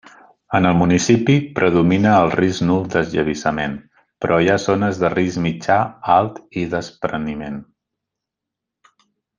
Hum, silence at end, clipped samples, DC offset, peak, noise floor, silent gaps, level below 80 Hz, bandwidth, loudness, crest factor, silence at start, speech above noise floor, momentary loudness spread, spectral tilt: none; 1.75 s; under 0.1%; under 0.1%; -2 dBFS; -83 dBFS; none; -48 dBFS; 9.4 kHz; -18 LUFS; 18 dB; 0.5 s; 66 dB; 11 LU; -6 dB/octave